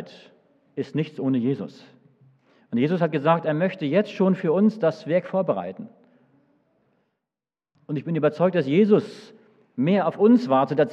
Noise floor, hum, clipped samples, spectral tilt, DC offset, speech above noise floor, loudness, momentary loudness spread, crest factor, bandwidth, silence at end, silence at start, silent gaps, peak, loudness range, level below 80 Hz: under -90 dBFS; none; under 0.1%; -8.5 dB/octave; under 0.1%; over 68 dB; -22 LUFS; 16 LU; 18 dB; 7.8 kHz; 0 s; 0 s; none; -4 dBFS; 7 LU; -88 dBFS